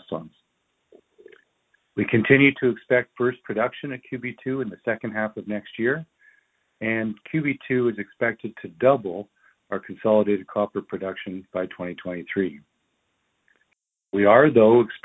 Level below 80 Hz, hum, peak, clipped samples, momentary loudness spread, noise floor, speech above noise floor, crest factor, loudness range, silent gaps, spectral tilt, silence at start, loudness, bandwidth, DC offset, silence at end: -62 dBFS; none; -2 dBFS; under 0.1%; 17 LU; -74 dBFS; 52 dB; 22 dB; 7 LU; none; -9.5 dB/octave; 0.1 s; -23 LUFS; 4 kHz; under 0.1%; 0.05 s